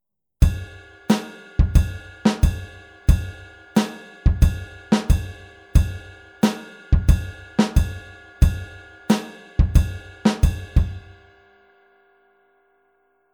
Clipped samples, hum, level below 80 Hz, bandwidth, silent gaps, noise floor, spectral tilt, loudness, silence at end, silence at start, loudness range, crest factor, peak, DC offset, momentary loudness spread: under 0.1%; none; -24 dBFS; 17.5 kHz; none; -64 dBFS; -6.5 dB/octave; -22 LUFS; 2.35 s; 0.4 s; 2 LU; 20 dB; -2 dBFS; under 0.1%; 18 LU